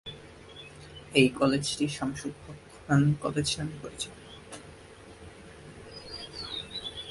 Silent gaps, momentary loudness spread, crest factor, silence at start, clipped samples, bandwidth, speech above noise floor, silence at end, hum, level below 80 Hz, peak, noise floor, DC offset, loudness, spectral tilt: none; 24 LU; 26 dB; 0.05 s; under 0.1%; 11.5 kHz; 22 dB; 0 s; none; -56 dBFS; -6 dBFS; -50 dBFS; under 0.1%; -29 LUFS; -5 dB/octave